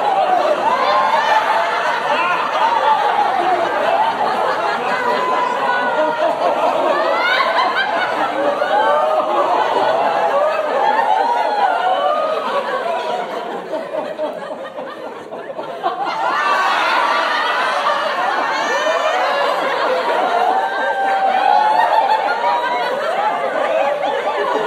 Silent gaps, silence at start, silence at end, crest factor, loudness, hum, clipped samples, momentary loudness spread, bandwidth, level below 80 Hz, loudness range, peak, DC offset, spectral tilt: none; 0 s; 0 s; 14 dB; -16 LUFS; none; under 0.1%; 8 LU; 15 kHz; -72 dBFS; 5 LU; -2 dBFS; under 0.1%; -3 dB/octave